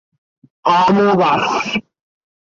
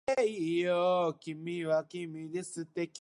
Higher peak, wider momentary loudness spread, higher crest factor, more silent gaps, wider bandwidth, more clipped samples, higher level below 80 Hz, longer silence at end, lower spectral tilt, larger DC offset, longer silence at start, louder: first, -2 dBFS vs -18 dBFS; second, 9 LU vs 12 LU; about the same, 14 dB vs 14 dB; neither; second, 7.6 kHz vs 11.5 kHz; neither; first, -56 dBFS vs -76 dBFS; first, 0.75 s vs 0 s; about the same, -5.5 dB/octave vs -5.5 dB/octave; neither; first, 0.65 s vs 0.1 s; first, -15 LUFS vs -33 LUFS